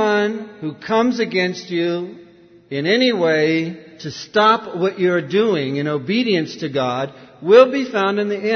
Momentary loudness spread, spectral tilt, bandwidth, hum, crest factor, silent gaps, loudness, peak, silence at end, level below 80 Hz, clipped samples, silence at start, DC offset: 14 LU; -5.5 dB/octave; 6.6 kHz; none; 18 dB; none; -18 LUFS; 0 dBFS; 0 s; -66 dBFS; under 0.1%; 0 s; under 0.1%